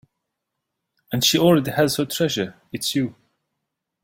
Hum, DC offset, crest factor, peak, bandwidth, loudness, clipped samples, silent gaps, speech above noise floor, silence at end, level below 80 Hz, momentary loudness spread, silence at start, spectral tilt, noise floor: none; under 0.1%; 20 dB; -4 dBFS; 16.5 kHz; -21 LUFS; under 0.1%; none; 60 dB; 0.95 s; -58 dBFS; 12 LU; 1.1 s; -4 dB/octave; -80 dBFS